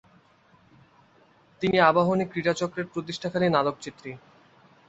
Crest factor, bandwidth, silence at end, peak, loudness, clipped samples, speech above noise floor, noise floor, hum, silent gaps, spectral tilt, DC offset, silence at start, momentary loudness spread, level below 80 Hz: 22 dB; 8.2 kHz; 0.7 s; -4 dBFS; -25 LUFS; under 0.1%; 35 dB; -60 dBFS; none; none; -6 dB/octave; under 0.1%; 1.6 s; 19 LU; -64 dBFS